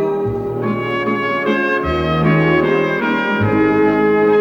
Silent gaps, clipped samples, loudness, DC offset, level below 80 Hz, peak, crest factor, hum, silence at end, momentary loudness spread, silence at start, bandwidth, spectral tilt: none; under 0.1%; -16 LUFS; under 0.1%; -40 dBFS; -2 dBFS; 12 dB; none; 0 s; 6 LU; 0 s; 17 kHz; -8 dB/octave